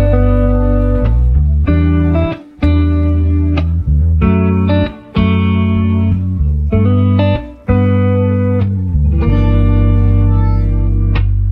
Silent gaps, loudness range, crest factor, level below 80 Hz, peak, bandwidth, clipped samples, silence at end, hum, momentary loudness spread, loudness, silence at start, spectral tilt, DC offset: none; 1 LU; 10 dB; -16 dBFS; 0 dBFS; 4.6 kHz; under 0.1%; 0 s; none; 4 LU; -13 LUFS; 0 s; -10.5 dB/octave; under 0.1%